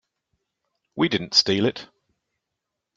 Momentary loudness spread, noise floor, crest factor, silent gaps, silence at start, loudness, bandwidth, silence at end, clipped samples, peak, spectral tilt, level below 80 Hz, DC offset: 20 LU; -83 dBFS; 24 dB; none; 0.95 s; -21 LUFS; 11.5 kHz; 1.1 s; under 0.1%; -4 dBFS; -4 dB/octave; -66 dBFS; under 0.1%